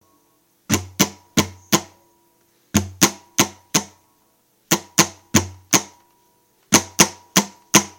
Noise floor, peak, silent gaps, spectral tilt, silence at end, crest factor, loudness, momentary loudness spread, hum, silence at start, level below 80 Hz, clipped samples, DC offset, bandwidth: -62 dBFS; 0 dBFS; none; -2.5 dB/octave; 0.1 s; 22 dB; -19 LUFS; 6 LU; none; 0.7 s; -52 dBFS; under 0.1%; under 0.1%; 17 kHz